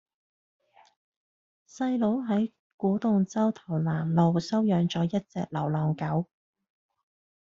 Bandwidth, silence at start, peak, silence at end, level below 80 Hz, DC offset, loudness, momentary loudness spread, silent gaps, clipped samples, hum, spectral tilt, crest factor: 7.4 kHz; 1.75 s; -10 dBFS; 1.2 s; -66 dBFS; under 0.1%; -28 LUFS; 7 LU; 2.59-2.78 s; under 0.1%; none; -7.5 dB/octave; 18 dB